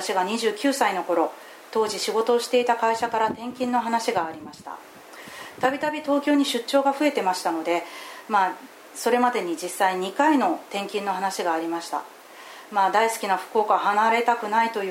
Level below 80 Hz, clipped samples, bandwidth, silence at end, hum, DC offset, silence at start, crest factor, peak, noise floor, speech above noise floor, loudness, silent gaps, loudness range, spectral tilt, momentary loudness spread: -74 dBFS; under 0.1%; 16.5 kHz; 0 s; none; under 0.1%; 0 s; 18 dB; -6 dBFS; -43 dBFS; 20 dB; -23 LUFS; none; 2 LU; -3 dB/octave; 18 LU